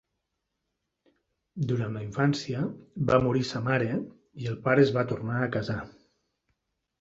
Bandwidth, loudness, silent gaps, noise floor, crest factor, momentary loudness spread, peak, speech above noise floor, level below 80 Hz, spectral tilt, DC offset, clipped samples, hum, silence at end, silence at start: 8 kHz; -28 LUFS; none; -82 dBFS; 22 dB; 13 LU; -6 dBFS; 55 dB; -58 dBFS; -7 dB/octave; under 0.1%; under 0.1%; none; 1.1 s; 1.55 s